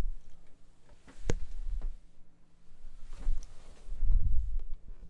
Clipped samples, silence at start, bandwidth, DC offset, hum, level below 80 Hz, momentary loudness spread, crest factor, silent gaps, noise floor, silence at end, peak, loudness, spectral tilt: under 0.1%; 0 s; 7.2 kHz; under 0.1%; none; -34 dBFS; 23 LU; 18 dB; none; -51 dBFS; 0 s; -12 dBFS; -40 LUFS; -6 dB/octave